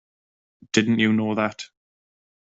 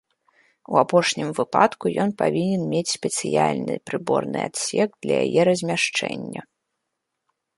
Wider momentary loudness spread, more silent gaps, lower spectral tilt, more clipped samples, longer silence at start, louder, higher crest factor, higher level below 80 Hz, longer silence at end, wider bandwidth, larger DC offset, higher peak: first, 17 LU vs 8 LU; neither; about the same, -5 dB/octave vs -4.5 dB/octave; neither; about the same, 0.75 s vs 0.7 s; about the same, -22 LUFS vs -22 LUFS; about the same, 20 dB vs 22 dB; about the same, -64 dBFS vs -66 dBFS; second, 0.75 s vs 1.15 s; second, 8 kHz vs 11.5 kHz; neither; second, -6 dBFS vs -2 dBFS